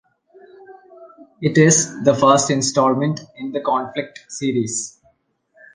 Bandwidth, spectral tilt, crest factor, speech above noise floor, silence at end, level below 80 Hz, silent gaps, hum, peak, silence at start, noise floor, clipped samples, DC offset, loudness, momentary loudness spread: 10.5 kHz; -4.5 dB/octave; 20 dB; 44 dB; 0.85 s; -60 dBFS; none; none; 0 dBFS; 0.7 s; -62 dBFS; under 0.1%; under 0.1%; -18 LUFS; 14 LU